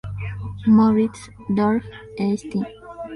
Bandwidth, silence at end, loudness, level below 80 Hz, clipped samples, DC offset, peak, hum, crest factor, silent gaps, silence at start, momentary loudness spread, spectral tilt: 11 kHz; 0 s; -21 LUFS; -46 dBFS; under 0.1%; under 0.1%; -6 dBFS; none; 16 dB; none; 0.05 s; 18 LU; -8 dB/octave